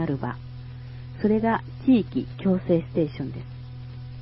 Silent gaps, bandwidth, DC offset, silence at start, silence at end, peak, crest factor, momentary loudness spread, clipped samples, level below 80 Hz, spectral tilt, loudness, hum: none; 5.8 kHz; under 0.1%; 0 s; 0 s; -10 dBFS; 16 dB; 18 LU; under 0.1%; -48 dBFS; -7.5 dB/octave; -25 LUFS; none